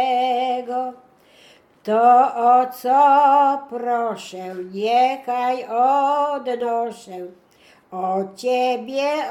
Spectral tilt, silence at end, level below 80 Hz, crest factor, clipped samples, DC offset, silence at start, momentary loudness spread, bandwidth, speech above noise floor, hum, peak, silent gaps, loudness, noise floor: -4.5 dB/octave; 0 s; -74 dBFS; 16 dB; under 0.1%; under 0.1%; 0 s; 17 LU; 15 kHz; 33 dB; none; -4 dBFS; none; -19 LUFS; -51 dBFS